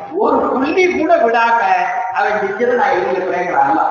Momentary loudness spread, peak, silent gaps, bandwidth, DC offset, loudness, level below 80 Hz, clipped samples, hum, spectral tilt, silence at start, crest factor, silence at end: 4 LU; -2 dBFS; none; 7 kHz; under 0.1%; -14 LUFS; -54 dBFS; under 0.1%; none; -5 dB/octave; 0 s; 14 dB; 0 s